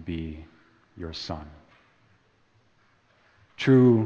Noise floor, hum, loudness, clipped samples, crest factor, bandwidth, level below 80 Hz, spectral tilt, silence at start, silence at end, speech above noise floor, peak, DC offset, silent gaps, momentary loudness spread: -64 dBFS; none; -25 LUFS; under 0.1%; 18 dB; 7.2 kHz; -52 dBFS; -8 dB/octave; 0 s; 0 s; 41 dB; -8 dBFS; under 0.1%; none; 24 LU